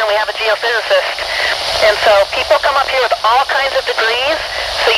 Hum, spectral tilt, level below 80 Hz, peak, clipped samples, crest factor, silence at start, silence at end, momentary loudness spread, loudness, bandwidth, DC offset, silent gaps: none; -1 dB/octave; -42 dBFS; 0 dBFS; under 0.1%; 14 dB; 0 s; 0 s; 4 LU; -13 LUFS; 16 kHz; under 0.1%; none